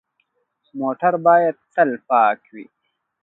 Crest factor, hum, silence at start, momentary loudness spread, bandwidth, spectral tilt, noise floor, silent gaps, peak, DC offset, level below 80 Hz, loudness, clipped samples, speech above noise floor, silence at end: 18 dB; none; 0.75 s; 12 LU; 4 kHz; -8.5 dB/octave; -69 dBFS; none; -2 dBFS; under 0.1%; -76 dBFS; -18 LUFS; under 0.1%; 51 dB; 0.6 s